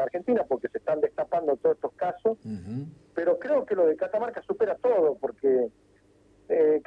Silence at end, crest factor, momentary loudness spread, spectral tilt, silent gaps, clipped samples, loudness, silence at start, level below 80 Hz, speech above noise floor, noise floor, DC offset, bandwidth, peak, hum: 0.05 s; 14 dB; 10 LU; -8.5 dB/octave; none; under 0.1%; -27 LUFS; 0 s; -68 dBFS; 35 dB; -61 dBFS; under 0.1%; 5.2 kHz; -12 dBFS; none